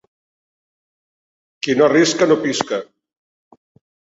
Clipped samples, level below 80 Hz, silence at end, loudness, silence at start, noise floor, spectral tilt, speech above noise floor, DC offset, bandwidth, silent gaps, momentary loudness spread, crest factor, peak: under 0.1%; -64 dBFS; 1.2 s; -16 LUFS; 1.65 s; under -90 dBFS; -4 dB/octave; over 74 dB; under 0.1%; 8 kHz; none; 12 LU; 20 dB; 0 dBFS